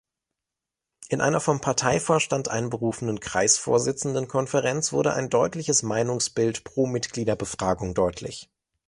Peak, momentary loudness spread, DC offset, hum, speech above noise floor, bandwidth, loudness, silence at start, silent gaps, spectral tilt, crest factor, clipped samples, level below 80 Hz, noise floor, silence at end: -6 dBFS; 6 LU; under 0.1%; none; 63 dB; 11.5 kHz; -24 LUFS; 1 s; none; -4 dB/octave; 20 dB; under 0.1%; -52 dBFS; -87 dBFS; 0.45 s